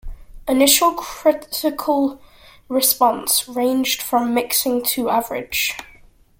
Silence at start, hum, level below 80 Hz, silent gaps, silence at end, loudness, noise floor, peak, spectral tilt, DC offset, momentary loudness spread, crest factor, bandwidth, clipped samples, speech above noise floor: 0.05 s; none; -44 dBFS; none; 0.55 s; -18 LUFS; -49 dBFS; 0 dBFS; -1.5 dB/octave; under 0.1%; 9 LU; 20 dB; 17 kHz; under 0.1%; 30 dB